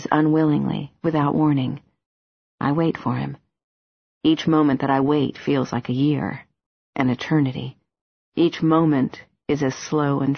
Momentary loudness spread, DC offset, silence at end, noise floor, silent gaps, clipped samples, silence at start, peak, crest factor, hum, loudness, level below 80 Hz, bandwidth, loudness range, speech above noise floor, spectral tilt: 11 LU; under 0.1%; 0 s; under -90 dBFS; 2.06-2.58 s, 3.64-4.21 s, 6.66-6.93 s, 8.01-8.32 s; under 0.1%; 0 s; -2 dBFS; 20 dB; none; -21 LUFS; -56 dBFS; 6.6 kHz; 3 LU; over 70 dB; -7 dB/octave